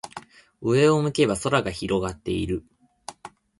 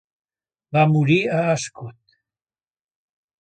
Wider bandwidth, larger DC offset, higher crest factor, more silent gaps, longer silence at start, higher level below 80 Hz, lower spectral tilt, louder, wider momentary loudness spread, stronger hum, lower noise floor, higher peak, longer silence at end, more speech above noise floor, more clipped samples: first, 11.5 kHz vs 9.2 kHz; neither; about the same, 18 dB vs 18 dB; neither; second, 0.05 s vs 0.7 s; first, -48 dBFS vs -64 dBFS; about the same, -5.5 dB/octave vs -6 dB/octave; second, -23 LUFS vs -19 LUFS; first, 22 LU vs 19 LU; neither; second, -45 dBFS vs under -90 dBFS; about the same, -6 dBFS vs -4 dBFS; second, 0.3 s vs 1.5 s; second, 22 dB vs over 71 dB; neither